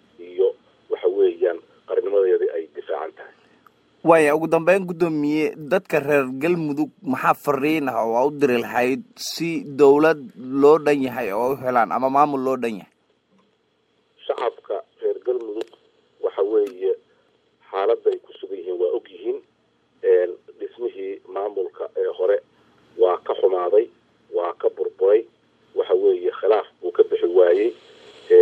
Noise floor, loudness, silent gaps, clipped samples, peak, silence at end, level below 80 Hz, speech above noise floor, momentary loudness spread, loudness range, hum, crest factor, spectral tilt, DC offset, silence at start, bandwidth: -65 dBFS; -21 LUFS; none; under 0.1%; 0 dBFS; 0 s; -70 dBFS; 46 dB; 13 LU; 7 LU; none; 20 dB; -6 dB/octave; under 0.1%; 0.2 s; 16 kHz